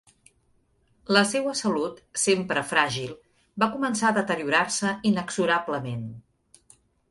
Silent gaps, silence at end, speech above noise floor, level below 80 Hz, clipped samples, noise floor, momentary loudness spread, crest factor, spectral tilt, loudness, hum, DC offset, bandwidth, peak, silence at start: none; 0.9 s; 41 dB; -64 dBFS; under 0.1%; -66 dBFS; 11 LU; 22 dB; -3.5 dB/octave; -25 LUFS; none; under 0.1%; 11.5 kHz; -6 dBFS; 1.1 s